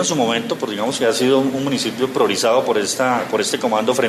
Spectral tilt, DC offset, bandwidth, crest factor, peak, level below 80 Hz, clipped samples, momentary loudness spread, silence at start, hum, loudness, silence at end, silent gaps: -3.5 dB/octave; under 0.1%; 14 kHz; 14 dB; -4 dBFS; -64 dBFS; under 0.1%; 5 LU; 0 s; none; -18 LUFS; 0 s; none